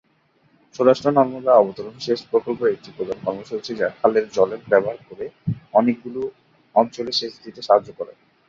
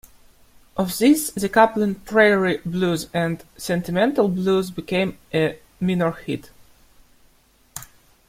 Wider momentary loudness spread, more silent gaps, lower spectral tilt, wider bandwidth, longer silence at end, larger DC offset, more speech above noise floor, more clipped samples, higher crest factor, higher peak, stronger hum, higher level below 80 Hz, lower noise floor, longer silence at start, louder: about the same, 16 LU vs 14 LU; neither; about the same, -6 dB/octave vs -5.5 dB/octave; second, 7.6 kHz vs 16.5 kHz; about the same, 0.35 s vs 0.45 s; neither; first, 41 dB vs 37 dB; neither; about the same, 20 dB vs 20 dB; about the same, -2 dBFS vs -2 dBFS; neither; second, -62 dBFS vs -52 dBFS; first, -62 dBFS vs -57 dBFS; about the same, 0.8 s vs 0.75 s; about the same, -21 LUFS vs -21 LUFS